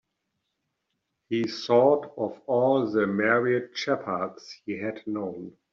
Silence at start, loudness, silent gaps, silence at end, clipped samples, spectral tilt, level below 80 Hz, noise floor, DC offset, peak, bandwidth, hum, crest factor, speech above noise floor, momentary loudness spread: 1.3 s; -26 LUFS; none; 0.25 s; under 0.1%; -4 dB/octave; -72 dBFS; -80 dBFS; under 0.1%; -8 dBFS; 7.4 kHz; none; 18 dB; 54 dB; 13 LU